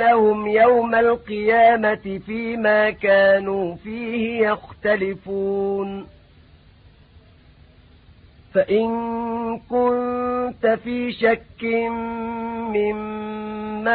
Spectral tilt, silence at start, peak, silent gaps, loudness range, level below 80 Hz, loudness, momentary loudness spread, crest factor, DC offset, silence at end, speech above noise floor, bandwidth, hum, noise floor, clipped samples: -10.5 dB/octave; 0 s; -6 dBFS; none; 10 LU; -52 dBFS; -20 LUFS; 12 LU; 16 dB; under 0.1%; 0 s; 30 dB; 4.7 kHz; none; -50 dBFS; under 0.1%